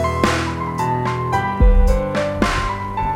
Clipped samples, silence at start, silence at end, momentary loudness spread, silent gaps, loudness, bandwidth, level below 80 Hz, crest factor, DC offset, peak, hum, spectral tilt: under 0.1%; 0 s; 0 s; 6 LU; none; -19 LUFS; 13 kHz; -20 dBFS; 16 dB; under 0.1%; 0 dBFS; none; -6 dB/octave